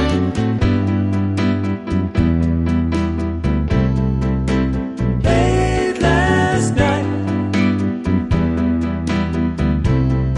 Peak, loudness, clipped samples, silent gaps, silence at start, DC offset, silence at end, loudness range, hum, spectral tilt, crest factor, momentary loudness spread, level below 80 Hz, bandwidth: -2 dBFS; -18 LUFS; under 0.1%; none; 0 s; under 0.1%; 0 s; 2 LU; none; -7 dB/octave; 14 dB; 5 LU; -26 dBFS; 11.5 kHz